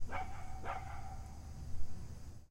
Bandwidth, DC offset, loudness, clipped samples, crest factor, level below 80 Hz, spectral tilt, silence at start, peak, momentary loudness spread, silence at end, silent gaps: 11 kHz; under 0.1%; -48 LUFS; under 0.1%; 16 dB; -48 dBFS; -5.5 dB/octave; 0 s; -22 dBFS; 6 LU; 0 s; none